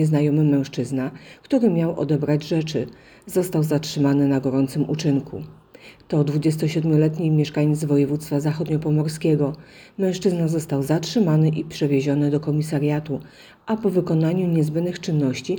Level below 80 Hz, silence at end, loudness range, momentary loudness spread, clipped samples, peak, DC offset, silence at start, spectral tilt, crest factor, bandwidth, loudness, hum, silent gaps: -56 dBFS; 0 s; 2 LU; 7 LU; under 0.1%; -6 dBFS; under 0.1%; 0 s; -7.5 dB/octave; 14 dB; 19.5 kHz; -21 LUFS; none; none